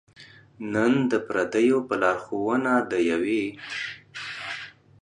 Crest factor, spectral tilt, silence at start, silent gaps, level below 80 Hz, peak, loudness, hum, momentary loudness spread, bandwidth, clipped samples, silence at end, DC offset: 18 dB; -5.5 dB/octave; 0.2 s; none; -64 dBFS; -8 dBFS; -25 LUFS; none; 13 LU; 10 kHz; under 0.1%; 0.35 s; under 0.1%